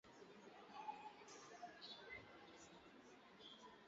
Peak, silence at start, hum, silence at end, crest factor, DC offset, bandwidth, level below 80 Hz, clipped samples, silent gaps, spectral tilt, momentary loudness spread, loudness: -40 dBFS; 0.05 s; none; 0 s; 20 dB; under 0.1%; 7.6 kHz; -86 dBFS; under 0.1%; none; -1 dB/octave; 9 LU; -59 LUFS